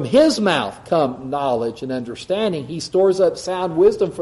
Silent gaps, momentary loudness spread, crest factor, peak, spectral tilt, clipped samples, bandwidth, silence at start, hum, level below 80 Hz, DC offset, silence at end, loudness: none; 9 LU; 16 dB; -2 dBFS; -5.5 dB/octave; under 0.1%; 11.5 kHz; 0 s; none; -52 dBFS; under 0.1%; 0 s; -19 LUFS